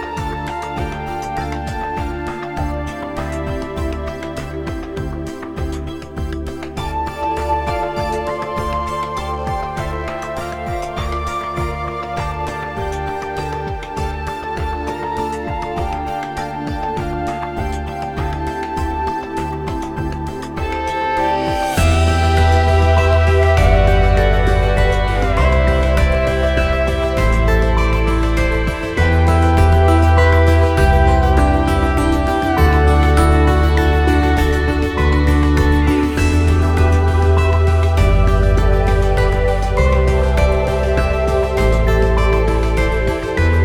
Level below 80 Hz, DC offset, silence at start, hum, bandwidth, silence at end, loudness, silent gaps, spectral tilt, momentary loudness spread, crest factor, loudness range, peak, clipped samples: -18 dBFS; under 0.1%; 0 s; none; 13.5 kHz; 0 s; -17 LUFS; none; -6.5 dB/octave; 11 LU; 14 dB; 10 LU; 0 dBFS; under 0.1%